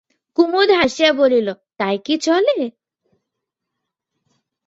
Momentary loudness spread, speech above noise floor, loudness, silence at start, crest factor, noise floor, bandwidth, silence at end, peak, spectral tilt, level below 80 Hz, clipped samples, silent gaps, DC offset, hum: 11 LU; 64 dB; -17 LUFS; 0.4 s; 18 dB; -80 dBFS; 8 kHz; 1.95 s; -2 dBFS; -4 dB/octave; -60 dBFS; under 0.1%; none; under 0.1%; none